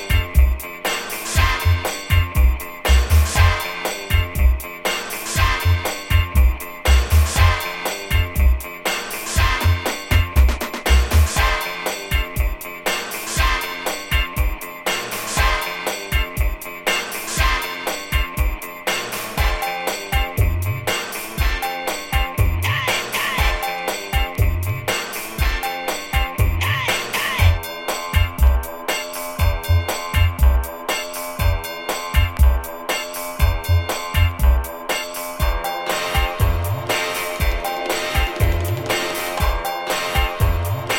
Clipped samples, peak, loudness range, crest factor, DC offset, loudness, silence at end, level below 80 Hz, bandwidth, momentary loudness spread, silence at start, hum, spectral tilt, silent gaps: under 0.1%; -2 dBFS; 3 LU; 18 dB; under 0.1%; -20 LUFS; 0 s; -22 dBFS; 17 kHz; 7 LU; 0 s; none; -4 dB/octave; none